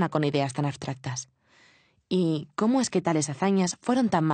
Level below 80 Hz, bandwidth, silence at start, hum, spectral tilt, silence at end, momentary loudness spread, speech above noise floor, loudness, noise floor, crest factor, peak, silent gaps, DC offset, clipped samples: -66 dBFS; 9.4 kHz; 0 s; none; -5.5 dB/octave; 0 s; 10 LU; 36 dB; -26 LUFS; -61 dBFS; 16 dB; -10 dBFS; none; under 0.1%; under 0.1%